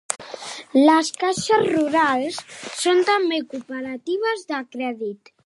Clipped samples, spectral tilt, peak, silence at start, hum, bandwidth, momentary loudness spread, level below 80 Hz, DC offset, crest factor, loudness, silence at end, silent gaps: under 0.1%; -3 dB/octave; 0 dBFS; 0.1 s; none; 11.5 kHz; 15 LU; -68 dBFS; under 0.1%; 20 dB; -21 LUFS; 0.3 s; none